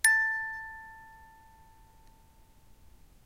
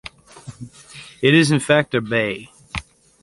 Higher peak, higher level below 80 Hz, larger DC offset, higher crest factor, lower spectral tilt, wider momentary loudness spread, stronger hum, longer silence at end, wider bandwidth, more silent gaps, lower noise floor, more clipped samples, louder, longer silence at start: second, -10 dBFS vs -2 dBFS; second, -60 dBFS vs -48 dBFS; neither; first, 26 dB vs 20 dB; second, 2 dB/octave vs -5 dB/octave; first, 28 LU vs 24 LU; neither; first, 2.15 s vs 0.4 s; first, 16 kHz vs 11.5 kHz; neither; first, -59 dBFS vs -41 dBFS; neither; second, -29 LUFS vs -17 LUFS; about the same, 0.05 s vs 0.05 s